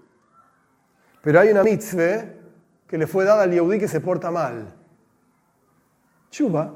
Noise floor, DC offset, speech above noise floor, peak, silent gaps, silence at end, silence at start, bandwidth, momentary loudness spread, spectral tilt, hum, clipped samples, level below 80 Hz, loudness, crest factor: -63 dBFS; under 0.1%; 44 dB; 0 dBFS; none; 0 s; 1.25 s; 16.5 kHz; 13 LU; -7 dB/octave; none; under 0.1%; -68 dBFS; -20 LUFS; 22 dB